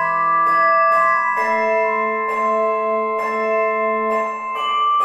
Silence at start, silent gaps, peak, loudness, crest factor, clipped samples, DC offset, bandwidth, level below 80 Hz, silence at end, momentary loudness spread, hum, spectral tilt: 0 s; none; -6 dBFS; -17 LUFS; 12 dB; under 0.1%; under 0.1%; 12.5 kHz; -70 dBFS; 0 s; 6 LU; none; -4 dB/octave